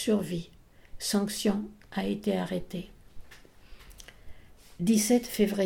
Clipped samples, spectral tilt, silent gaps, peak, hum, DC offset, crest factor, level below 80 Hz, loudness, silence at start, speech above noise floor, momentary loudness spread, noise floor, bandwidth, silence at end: under 0.1%; -4.5 dB/octave; none; -12 dBFS; none; under 0.1%; 18 dB; -54 dBFS; -29 LUFS; 0 s; 26 dB; 24 LU; -53 dBFS; 18.5 kHz; 0 s